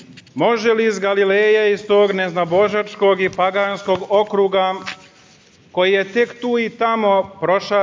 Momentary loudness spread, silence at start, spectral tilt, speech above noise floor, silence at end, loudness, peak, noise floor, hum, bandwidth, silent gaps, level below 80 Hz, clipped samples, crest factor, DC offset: 5 LU; 0 s; -5 dB/octave; 33 dB; 0 s; -17 LUFS; -4 dBFS; -49 dBFS; none; 7.6 kHz; none; -60 dBFS; under 0.1%; 14 dB; under 0.1%